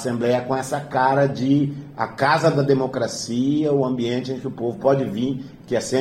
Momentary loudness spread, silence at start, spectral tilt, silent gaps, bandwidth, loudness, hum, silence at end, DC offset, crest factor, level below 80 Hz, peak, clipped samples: 8 LU; 0 s; -6 dB/octave; none; 15 kHz; -21 LUFS; none; 0 s; under 0.1%; 16 dB; -58 dBFS; -4 dBFS; under 0.1%